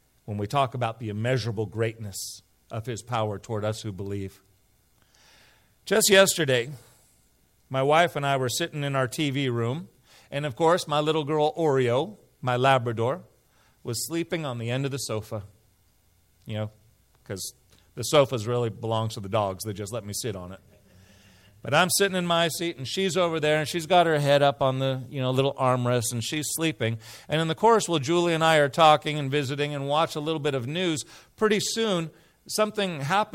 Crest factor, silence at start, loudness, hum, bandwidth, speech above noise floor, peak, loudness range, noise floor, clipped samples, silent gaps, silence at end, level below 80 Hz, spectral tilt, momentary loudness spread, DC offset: 20 dB; 0.25 s; -25 LUFS; none; 16 kHz; 39 dB; -6 dBFS; 9 LU; -64 dBFS; under 0.1%; none; 0.05 s; -64 dBFS; -4.5 dB/octave; 14 LU; under 0.1%